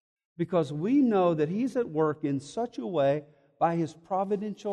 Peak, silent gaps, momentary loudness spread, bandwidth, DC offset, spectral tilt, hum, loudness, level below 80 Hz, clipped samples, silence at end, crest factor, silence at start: -12 dBFS; none; 8 LU; 10 kHz; under 0.1%; -8 dB/octave; none; -28 LUFS; -72 dBFS; under 0.1%; 0 s; 16 dB; 0.4 s